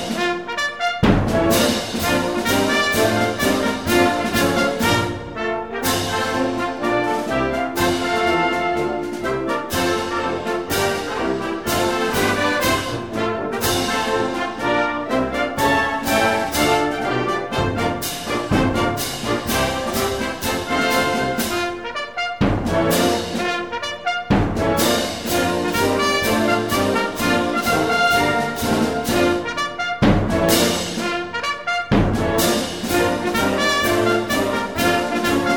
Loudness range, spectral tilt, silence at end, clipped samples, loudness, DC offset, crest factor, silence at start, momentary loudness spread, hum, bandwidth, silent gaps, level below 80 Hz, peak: 3 LU; -4 dB/octave; 0 s; under 0.1%; -19 LUFS; 0.4%; 16 dB; 0 s; 6 LU; none; 18 kHz; none; -38 dBFS; -2 dBFS